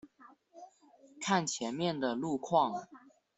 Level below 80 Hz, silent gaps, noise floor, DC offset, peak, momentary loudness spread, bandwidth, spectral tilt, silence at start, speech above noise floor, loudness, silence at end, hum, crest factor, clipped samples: -76 dBFS; none; -62 dBFS; under 0.1%; -14 dBFS; 7 LU; 8.2 kHz; -4 dB/octave; 0.05 s; 29 dB; -33 LUFS; 0.4 s; none; 22 dB; under 0.1%